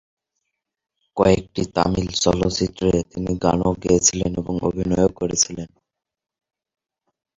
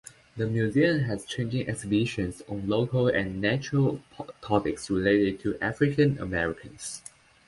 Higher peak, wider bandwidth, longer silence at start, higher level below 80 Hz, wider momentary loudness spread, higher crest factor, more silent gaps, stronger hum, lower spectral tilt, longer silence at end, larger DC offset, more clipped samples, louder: first, -2 dBFS vs -8 dBFS; second, 7.8 kHz vs 11.5 kHz; first, 1.15 s vs 0.35 s; first, -40 dBFS vs -52 dBFS; second, 8 LU vs 14 LU; about the same, 20 dB vs 18 dB; neither; neither; second, -4.5 dB/octave vs -6 dB/octave; first, 1.7 s vs 0.5 s; neither; neither; first, -20 LUFS vs -27 LUFS